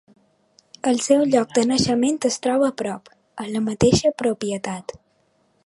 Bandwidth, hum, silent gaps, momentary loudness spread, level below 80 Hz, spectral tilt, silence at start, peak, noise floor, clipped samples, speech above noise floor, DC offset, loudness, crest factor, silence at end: 11.5 kHz; none; none; 15 LU; -48 dBFS; -4.5 dB/octave; 0.85 s; -4 dBFS; -64 dBFS; under 0.1%; 44 dB; under 0.1%; -21 LUFS; 18 dB; 0.85 s